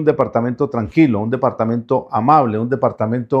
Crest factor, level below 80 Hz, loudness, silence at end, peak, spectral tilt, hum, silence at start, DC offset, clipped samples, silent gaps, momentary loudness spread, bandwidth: 16 dB; -52 dBFS; -17 LUFS; 0 s; 0 dBFS; -10 dB/octave; none; 0 s; under 0.1%; under 0.1%; none; 6 LU; 6.4 kHz